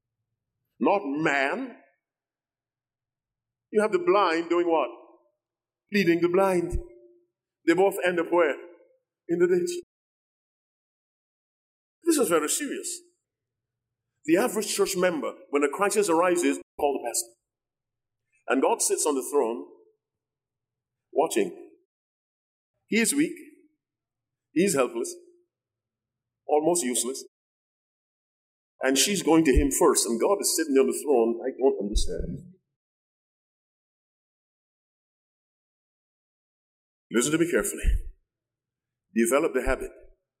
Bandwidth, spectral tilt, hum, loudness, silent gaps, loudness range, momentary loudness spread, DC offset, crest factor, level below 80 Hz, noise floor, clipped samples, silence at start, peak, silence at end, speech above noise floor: 16 kHz; -3.5 dB/octave; none; -25 LUFS; 9.83-12.02 s, 16.63-16.78 s, 21.85-22.74 s, 27.28-28.79 s, 32.76-37.10 s; 7 LU; 12 LU; under 0.1%; 20 dB; -42 dBFS; under -90 dBFS; under 0.1%; 0.8 s; -8 dBFS; 0.35 s; over 66 dB